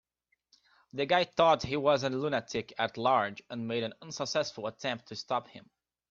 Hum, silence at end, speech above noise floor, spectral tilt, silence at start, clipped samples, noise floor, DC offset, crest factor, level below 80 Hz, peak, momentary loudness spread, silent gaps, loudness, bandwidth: none; 0.5 s; 48 dB; -4.5 dB/octave; 0.95 s; under 0.1%; -79 dBFS; under 0.1%; 20 dB; -68 dBFS; -12 dBFS; 12 LU; none; -31 LUFS; 7.6 kHz